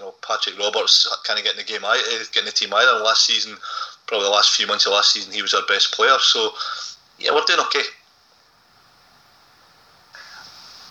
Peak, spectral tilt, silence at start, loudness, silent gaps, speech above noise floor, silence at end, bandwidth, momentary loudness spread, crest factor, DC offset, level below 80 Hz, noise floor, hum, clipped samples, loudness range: -2 dBFS; 1.5 dB/octave; 0 s; -17 LUFS; none; 37 dB; 0 s; 16 kHz; 12 LU; 18 dB; under 0.1%; -76 dBFS; -56 dBFS; none; under 0.1%; 7 LU